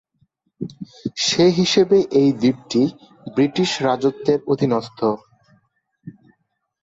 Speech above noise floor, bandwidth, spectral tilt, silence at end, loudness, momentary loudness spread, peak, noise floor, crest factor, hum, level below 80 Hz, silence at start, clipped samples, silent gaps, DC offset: 51 dB; 8 kHz; -5 dB/octave; 0.75 s; -18 LUFS; 16 LU; -4 dBFS; -69 dBFS; 16 dB; none; -60 dBFS; 0.6 s; under 0.1%; none; under 0.1%